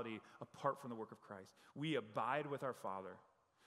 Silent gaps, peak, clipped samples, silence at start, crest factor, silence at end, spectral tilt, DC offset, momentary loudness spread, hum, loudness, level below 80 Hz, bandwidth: none; -24 dBFS; under 0.1%; 0 s; 22 dB; 0.45 s; -6 dB/octave; under 0.1%; 15 LU; none; -45 LUFS; under -90 dBFS; 15.5 kHz